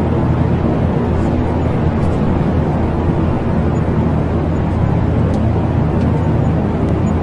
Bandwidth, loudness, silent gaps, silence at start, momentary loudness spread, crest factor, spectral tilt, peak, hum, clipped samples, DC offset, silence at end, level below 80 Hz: 7.4 kHz; -16 LUFS; none; 0 s; 1 LU; 12 dB; -9.5 dB/octave; -2 dBFS; none; under 0.1%; under 0.1%; 0 s; -26 dBFS